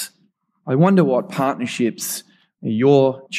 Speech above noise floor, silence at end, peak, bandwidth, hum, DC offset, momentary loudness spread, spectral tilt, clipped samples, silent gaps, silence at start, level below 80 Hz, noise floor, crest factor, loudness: 46 dB; 0 s; -2 dBFS; 15.5 kHz; none; under 0.1%; 15 LU; -6 dB/octave; under 0.1%; none; 0 s; -70 dBFS; -63 dBFS; 16 dB; -18 LUFS